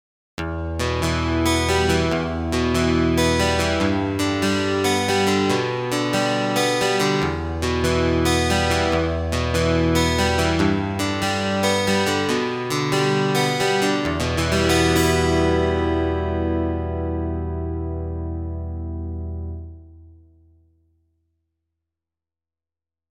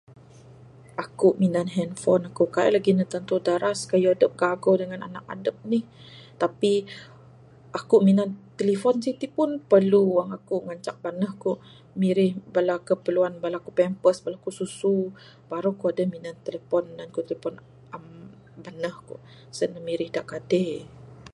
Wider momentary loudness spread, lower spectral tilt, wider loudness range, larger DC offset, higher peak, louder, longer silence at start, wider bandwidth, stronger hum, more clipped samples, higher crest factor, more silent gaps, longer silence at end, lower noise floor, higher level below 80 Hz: second, 10 LU vs 16 LU; second, -5 dB/octave vs -6.5 dB/octave; about the same, 10 LU vs 8 LU; neither; about the same, -6 dBFS vs -6 dBFS; first, -21 LUFS vs -25 LUFS; second, 0.4 s vs 1 s; first, 18 kHz vs 11.5 kHz; neither; neither; about the same, 16 dB vs 20 dB; neither; first, 3.05 s vs 0.05 s; first, under -90 dBFS vs -50 dBFS; first, -38 dBFS vs -66 dBFS